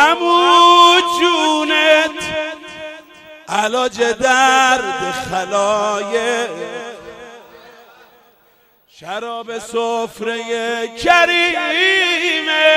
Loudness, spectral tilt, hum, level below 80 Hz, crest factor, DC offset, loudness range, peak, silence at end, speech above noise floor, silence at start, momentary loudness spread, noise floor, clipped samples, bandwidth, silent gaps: -14 LUFS; -1.5 dB/octave; none; -54 dBFS; 16 dB; under 0.1%; 14 LU; 0 dBFS; 0 s; 38 dB; 0 s; 17 LU; -54 dBFS; under 0.1%; 16 kHz; none